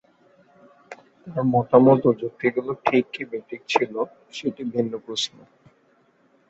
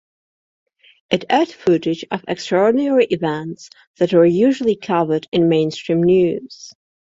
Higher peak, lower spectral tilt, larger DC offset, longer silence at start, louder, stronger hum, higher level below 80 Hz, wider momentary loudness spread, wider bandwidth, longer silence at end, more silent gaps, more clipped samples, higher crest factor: about the same, -2 dBFS vs -2 dBFS; about the same, -6 dB/octave vs -6.5 dB/octave; neither; second, 0.9 s vs 1.1 s; second, -23 LUFS vs -17 LUFS; neither; second, -64 dBFS vs -58 dBFS; first, 15 LU vs 11 LU; about the same, 8 kHz vs 7.8 kHz; first, 1.2 s vs 0.35 s; second, none vs 3.87-3.94 s, 5.28-5.32 s; neither; first, 22 dB vs 16 dB